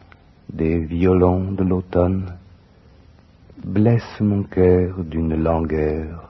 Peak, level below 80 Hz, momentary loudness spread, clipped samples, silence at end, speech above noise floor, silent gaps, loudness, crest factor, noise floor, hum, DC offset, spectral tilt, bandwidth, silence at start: -2 dBFS; -36 dBFS; 9 LU; under 0.1%; 0.05 s; 31 dB; none; -19 LUFS; 18 dB; -49 dBFS; none; under 0.1%; -11 dB/octave; 6 kHz; 0.5 s